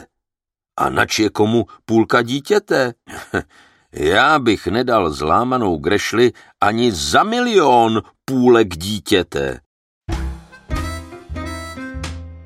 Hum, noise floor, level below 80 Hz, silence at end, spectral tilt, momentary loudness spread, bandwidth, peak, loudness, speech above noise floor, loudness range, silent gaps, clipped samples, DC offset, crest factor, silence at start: none; -86 dBFS; -36 dBFS; 0 s; -4.5 dB/octave; 16 LU; 15.5 kHz; -2 dBFS; -17 LUFS; 70 dB; 5 LU; 9.66-10.01 s; under 0.1%; under 0.1%; 16 dB; 0 s